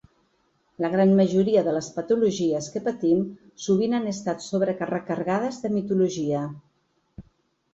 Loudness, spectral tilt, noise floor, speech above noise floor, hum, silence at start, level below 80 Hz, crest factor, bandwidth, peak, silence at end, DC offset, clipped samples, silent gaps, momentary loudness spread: -24 LUFS; -6.5 dB/octave; -69 dBFS; 46 dB; none; 0.8 s; -62 dBFS; 16 dB; 8 kHz; -8 dBFS; 0.55 s; under 0.1%; under 0.1%; none; 9 LU